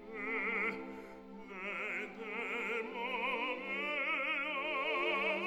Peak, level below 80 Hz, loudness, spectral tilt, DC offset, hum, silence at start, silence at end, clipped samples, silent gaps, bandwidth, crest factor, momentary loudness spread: -22 dBFS; -72 dBFS; -36 LUFS; -4.5 dB/octave; under 0.1%; none; 0 s; 0 s; under 0.1%; none; 18.5 kHz; 16 dB; 12 LU